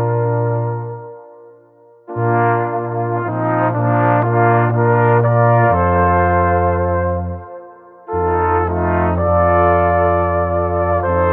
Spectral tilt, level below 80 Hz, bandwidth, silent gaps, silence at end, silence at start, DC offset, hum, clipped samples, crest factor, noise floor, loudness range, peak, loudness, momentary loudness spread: -12.5 dB/octave; -36 dBFS; 3.3 kHz; none; 0 s; 0 s; under 0.1%; none; under 0.1%; 14 dB; -47 dBFS; 6 LU; -2 dBFS; -15 LUFS; 10 LU